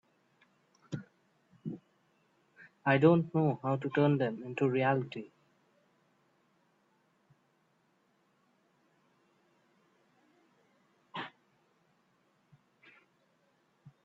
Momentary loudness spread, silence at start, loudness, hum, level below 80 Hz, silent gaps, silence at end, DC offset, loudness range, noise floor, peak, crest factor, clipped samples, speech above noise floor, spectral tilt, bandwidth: 20 LU; 0.9 s; -30 LUFS; none; -78 dBFS; none; 0.15 s; under 0.1%; 22 LU; -73 dBFS; -12 dBFS; 24 dB; under 0.1%; 44 dB; -9 dB/octave; 7.6 kHz